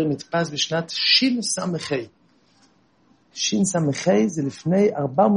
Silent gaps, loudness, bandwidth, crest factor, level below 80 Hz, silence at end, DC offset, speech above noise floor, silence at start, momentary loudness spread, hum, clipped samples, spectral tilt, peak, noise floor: none; -21 LUFS; 11 kHz; 18 dB; -66 dBFS; 0 s; under 0.1%; 39 dB; 0 s; 10 LU; none; under 0.1%; -4 dB/octave; -4 dBFS; -60 dBFS